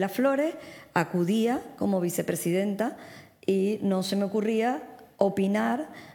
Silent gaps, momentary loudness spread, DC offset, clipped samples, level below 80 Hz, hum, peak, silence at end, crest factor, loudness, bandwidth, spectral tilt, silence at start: none; 8 LU; under 0.1%; under 0.1%; -72 dBFS; none; -6 dBFS; 0.05 s; 20 dB; -27 LUFS; 19.5 kHz; -6 dB/octave; 0 s